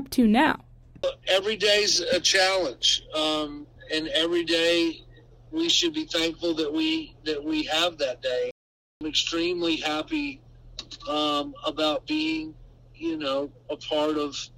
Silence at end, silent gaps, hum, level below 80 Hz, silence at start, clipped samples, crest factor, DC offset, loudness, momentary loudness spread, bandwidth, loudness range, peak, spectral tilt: 0.1 s; 8.51-9.01 s; none; -54 dBFS; 0 s; under 0.1%; 20 dB; under 0.1%; -25 LUFS; 14 LU; 16 kHz; 6 LU; -6 dBFS; -2.5 dB/octave